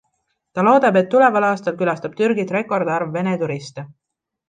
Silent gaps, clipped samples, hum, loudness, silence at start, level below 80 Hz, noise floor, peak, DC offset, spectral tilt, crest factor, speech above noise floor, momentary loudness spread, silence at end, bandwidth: none; under 0.1%; none; -18 LUFS; 0.55 s; -68 dBFS; -71 dBFS; -2 dBFS; under 0.1%; -7 dB/octave; 16 dB; 53 dB; 13 LU; 0.65 s; 9.4 kHz